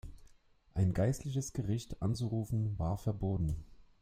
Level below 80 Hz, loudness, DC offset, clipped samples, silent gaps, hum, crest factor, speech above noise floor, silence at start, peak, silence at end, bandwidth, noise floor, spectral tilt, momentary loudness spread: -50 dBFS; -36 LUFS; under 0.1%; under 0.1%; none; none; 16 dB; 29 dB; 0.05 s; -18 dBFS; 0.15 s; 15.5 kHz; -63 dBFS; -7 dB/octave; 6 LU